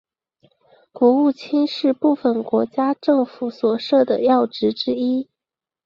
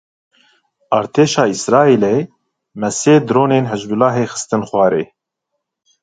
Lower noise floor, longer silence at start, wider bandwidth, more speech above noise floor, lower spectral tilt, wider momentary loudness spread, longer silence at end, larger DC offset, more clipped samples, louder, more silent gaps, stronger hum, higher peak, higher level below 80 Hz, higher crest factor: first, -88 dBFS vs -76 dBFS; about the same, 0.95 s vs 0.9 s; second, 7 kHz vs 9.6 kHz; first, 70 dB vs 62 dB; first, -7 dB/octave vs -5.5 dB/octave; second, 6 LU vs 9 LU; second, 0.6 s vs 0.95 s; neither; neither; second, -19 LUFS vs -15 LUFS; neither; neither; second, -4 dBFS vs 0 dBFS; second, -66 dBFS vs -58 dBFS; about the same, 16 dB vs 16 dB